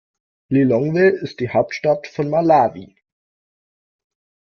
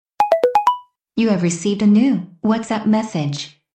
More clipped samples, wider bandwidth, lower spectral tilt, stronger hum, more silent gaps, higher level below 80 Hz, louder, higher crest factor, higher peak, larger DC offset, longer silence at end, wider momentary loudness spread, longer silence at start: neither; second, 6.8 kHz vs 9 kHz; first, -8 dB/octave vs -6 dB/octave; neither; neither; about the same, -58 dBFS vs -58 dBFS; about the same, -18 LUFS vs -18 LUFS; about the same, 18 dB vs 16 dB; about the same, -2 dBFS vs -2 dBFS; neither; first, 1.65 s vs 0.3 s; second, 6 LU vs 10 LU; first, 0.5 s vs 0.2 s